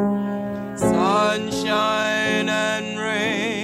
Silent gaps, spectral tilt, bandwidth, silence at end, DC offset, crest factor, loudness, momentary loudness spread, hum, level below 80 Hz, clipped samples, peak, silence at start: none; -4.5 dB/octave; 15.5 kHz; 0 s; under 0.1%; 12 dB; -21 LUFS; 6 LU; none; -52 dBFS; under 0.1%; -8 dBFS; 0 s